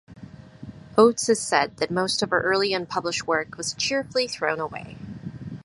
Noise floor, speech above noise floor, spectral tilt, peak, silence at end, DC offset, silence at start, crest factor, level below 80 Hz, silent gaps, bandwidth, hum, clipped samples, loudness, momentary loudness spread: -44 dBFS; 20 dB; -3 dB/octave; -2 dBFS; 0.05 s; under 0.1%; 0.1 s; 22 dB; -58 dBFS; none; 11.5 kHz; none; under 0.1%; -23 LUFS; 19 LU